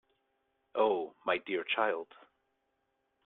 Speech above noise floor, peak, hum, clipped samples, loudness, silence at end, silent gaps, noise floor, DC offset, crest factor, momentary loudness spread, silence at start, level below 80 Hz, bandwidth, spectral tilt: 47 dB; -16 dBFS; none; under 0.1%; -33 LUFS; 1.2 s; none; -80 dBFS; under 0.1%; 20 dB; 10 LU; 0.75 s; -80 dBFS; 4.2 kHz; -6.5 dB/octave